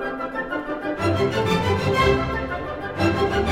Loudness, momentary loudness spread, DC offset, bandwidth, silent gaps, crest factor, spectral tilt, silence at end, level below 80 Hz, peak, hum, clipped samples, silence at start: -23 LUFS; 9 LU; under 0.1%; 16 kHz; none; 16 dB; -6 dB/octave; 0 s; -38 dBFS; -6 dBFS; none; under 0.1%; 0 s